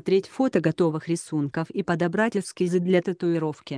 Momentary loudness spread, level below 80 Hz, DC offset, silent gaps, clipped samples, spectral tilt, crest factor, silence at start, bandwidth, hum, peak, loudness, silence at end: 5 LU; -66 dBFS; under 0.1%; none; under 0.1%; -6.5 dB/octave; 18 dB; 0.05 s; 10.5 kHz; none; -8 dBFS; -25 LUFS; 0 s